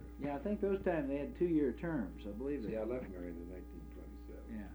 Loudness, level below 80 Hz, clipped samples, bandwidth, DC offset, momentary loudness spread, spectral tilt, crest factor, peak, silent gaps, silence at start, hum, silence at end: -39 LUFS; -52 dBFS; under 0.1%; over 20 kHz; under 0.1%; 16 LU; -9 dB/octave; 16 dB; -22 dBFS; none; 0 s; none; 0 s